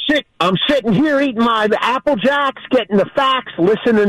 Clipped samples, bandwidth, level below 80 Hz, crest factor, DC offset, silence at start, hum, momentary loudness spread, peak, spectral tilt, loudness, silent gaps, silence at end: under 0.1%; 13.5 kHz; -50 dBFS; 10 dB; under 0.1%; 0 s; none; 3 LU; -6 dBFS; -6 dB/octave; -15 LUFS; none; 0 s